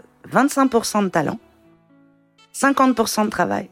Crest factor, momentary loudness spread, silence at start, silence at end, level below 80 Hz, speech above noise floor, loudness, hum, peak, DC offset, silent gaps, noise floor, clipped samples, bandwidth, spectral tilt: 18 dB; 8 LU; 0.25 s; 0.05 s; -58 dBFS; 37 dB; -19 LUFS; none; -2 dBFS; under 0.1%; none; -55 dBFS; under 0.1%; 16.5 kHz; -4.5 dB/octave